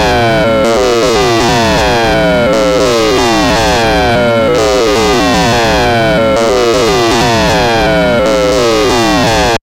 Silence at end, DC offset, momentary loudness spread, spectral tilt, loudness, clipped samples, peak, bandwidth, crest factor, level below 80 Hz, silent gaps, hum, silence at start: 0.05 s; under 0.1%; 0 LU; -4.5 dB/octave; -9 LUFS; under 0.1%; -2 dBFS; 17 kHz; 8 dB; -26 dBFS; none; none; 0 s